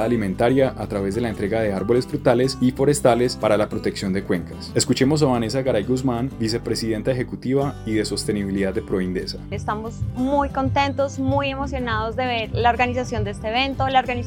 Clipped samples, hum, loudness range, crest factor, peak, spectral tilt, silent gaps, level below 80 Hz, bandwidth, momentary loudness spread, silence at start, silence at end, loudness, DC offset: under 0.1%; none; 4 LU; 18 dB; -2 dBFS; -5.5 dB/octave; none; -38 dBFS; 17 kHz; 7 LU; 0 s; 0 s; -22 LUFS; under 0.1%